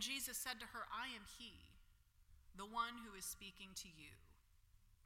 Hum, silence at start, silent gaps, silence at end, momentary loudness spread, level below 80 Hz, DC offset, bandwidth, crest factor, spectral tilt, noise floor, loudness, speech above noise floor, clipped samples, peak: none; 0 s; none; 0.05 s; 18 LU; -70 dBFS; under 0.1%; 16.5 kHz; 22 dB; -1 dB/octave; -71 dBFS; -49 LUFS; 20 dB; under 0.1%; -30 dBFS